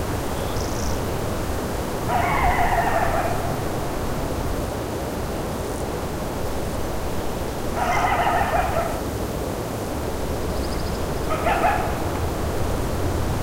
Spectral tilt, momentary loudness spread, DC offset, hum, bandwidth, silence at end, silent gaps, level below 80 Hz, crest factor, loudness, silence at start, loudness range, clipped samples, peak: -5.5 dB/octave; 7 LU; under 0.1%; none; 16 kHz; 0 s; none; -32 dBFS; 18 dB; -25 LUFS; 0 s; 4 LU; under 0.1%; -6 dBFS